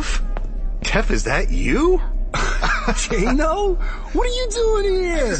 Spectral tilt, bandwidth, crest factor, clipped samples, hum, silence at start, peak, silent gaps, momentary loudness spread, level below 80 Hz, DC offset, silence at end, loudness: -4.5 dB/octave; 8.8 kHz; 16 dB; under 0.1%; none; 0 s; -4 dBFS; none; 8 LU; -22 dBFS; under 0.1%; 0 s; -21 LUFS